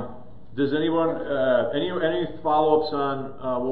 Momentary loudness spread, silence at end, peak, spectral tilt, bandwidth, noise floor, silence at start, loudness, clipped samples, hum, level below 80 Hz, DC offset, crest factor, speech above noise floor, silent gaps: 8 LU; 0 s; -6 dBFS; -10 dB/octave; 5.2 kHz; -44 dBFS; 0 s; -24 LUFS; under 0.1%; none; -54 dBFS; 1%; 18 dB; 21 dB; none